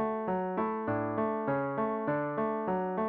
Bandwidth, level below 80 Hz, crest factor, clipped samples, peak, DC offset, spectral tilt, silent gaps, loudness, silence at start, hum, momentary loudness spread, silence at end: 4.4 kHz; -66 dBFS; 12 dB; under 0.1%; -18 dBFS; under 0.1%; -7.5 dB/octave; none; -32 LUFS; 0 s; none; 1 LU; 0 s